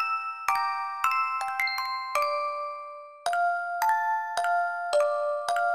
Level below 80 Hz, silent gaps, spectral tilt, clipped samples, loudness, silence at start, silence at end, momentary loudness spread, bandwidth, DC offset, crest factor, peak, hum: -76 dBFS; none; 1 dB/octave; under 0.1%; -28 LUFS; 0 s; 0 s; 6 LU; 15.5 kHz; under 0.1%; 20 dB; -8 dBFS; none